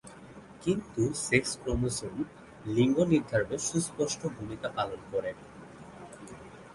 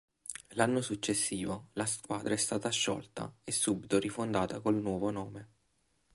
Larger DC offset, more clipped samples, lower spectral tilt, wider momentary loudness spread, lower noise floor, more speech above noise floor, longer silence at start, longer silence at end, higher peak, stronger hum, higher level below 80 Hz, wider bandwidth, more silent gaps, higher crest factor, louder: neither; neither; first, -5 dB/octave vs -3.5 dB/octave; first, 22 LU vs 12 LU; second, -50 dBFS vs -76 dBFS; second, 20 dB vs 42 dB; second, 0.05 s vs 0.3 s; second, 0 s vs 0.7 s; first, -8 dBFS vs -12 dBFS; neither; first, -52 dBFS vs -64 dBFS; about the same, 11.5 kHz vs 12 kHz; neither; about the same, 22 dB vs 22 dB; about the same, -31 LUFS vs -33 LUFS